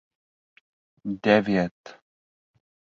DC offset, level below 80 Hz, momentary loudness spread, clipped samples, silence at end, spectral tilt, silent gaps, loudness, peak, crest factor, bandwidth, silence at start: under 0.1%; -62 dBFS; 15 LU; under 0.1%; 1 s; -7 dB/octave; 1.71-1.84 s; -24 LUFS; -4 dBFS; 24 dB; 7.4 kHz; 1.05 s